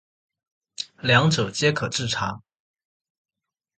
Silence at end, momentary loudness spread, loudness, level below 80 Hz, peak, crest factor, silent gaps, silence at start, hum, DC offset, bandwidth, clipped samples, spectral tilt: 1.4 s; 17 LU; -22 LUFS; -56 dBFS; -4 dBFS; 22 dB; none; 0.8 s; none; under 0.1%; 9.2 kHz; under 0.1%; -4 dB/octave